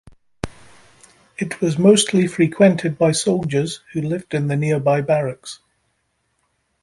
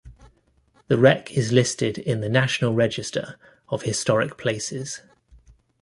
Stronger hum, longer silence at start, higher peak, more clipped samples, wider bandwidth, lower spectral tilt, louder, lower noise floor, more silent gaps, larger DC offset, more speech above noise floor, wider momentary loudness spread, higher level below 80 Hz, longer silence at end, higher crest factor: neither; first, 0.45 s vs 0.05 s; about the same, -2 dBFS vs -2 dBFS; neither; about the same, 11.5 kHz vs 11.5 kHz; about the same, -5.5 dB/octave vs -5 dB/octave; first, -18 LUFS vs -22 LUFS; first, -69 dBFS vs -61 dBFS; neither; neither; first, 51 dB vs 39 dB; first, 19 LU vs 13 LU; about the same, -52 dBFS vs -56 dBFS; first, 1.25 s vs 0.85 s; about the same, 18 dB vs 22 dB